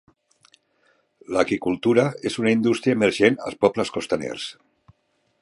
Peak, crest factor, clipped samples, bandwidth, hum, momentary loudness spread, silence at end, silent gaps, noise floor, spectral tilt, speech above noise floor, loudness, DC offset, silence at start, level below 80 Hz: -2 dBFS; 20 dB; under 0.1%; 11.5 kHz; none; 8 LU; 0.9 s; none; -69 dBFS; -5.5 dB/octave; 47 dB; -22 LUFS; under 0.1%; 1.3 s; -60 dBFS